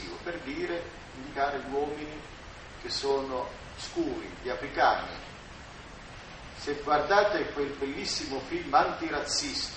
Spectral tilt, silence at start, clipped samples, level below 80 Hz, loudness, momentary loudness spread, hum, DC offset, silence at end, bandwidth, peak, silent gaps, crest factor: -3 dB/octave; 0 s; under 0.1%; -52 dBFS; -30 LUFS; 19 LU; none; under 0.1%; 0 s; 8.4 kHz; -10 dBFS; none; 22 dB